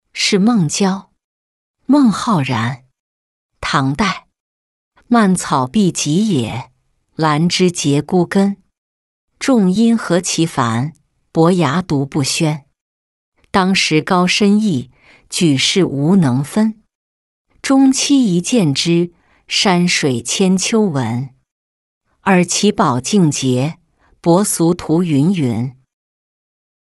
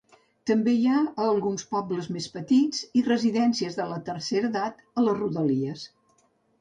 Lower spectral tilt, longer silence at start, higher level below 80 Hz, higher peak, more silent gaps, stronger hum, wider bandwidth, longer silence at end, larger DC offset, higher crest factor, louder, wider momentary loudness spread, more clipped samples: about the same, -5 dB/octave vs -5.5 dB/octave; second, 0.15 s vs 0.45 s; first, -50 dBFS vs -68 dBFS; first, -2 dBFS vs -12 dBFS; first, 1.24-1.74 s, 2.99-3.49 s, 4.40-4.91 s, 8.78-9.28 s, 12.81-13.32 s, 16.95-17.45 s, 21.52-22.01 s vs none; neither; first, 12 kHz vs 9.4 kHz; first, 1.15 s vs 0.75 s; neither; about the same, 14 dB vs 14 dB; first, -15 LUFS vs -26 LUFS; about the same, 10 LU vs 10 LU; neither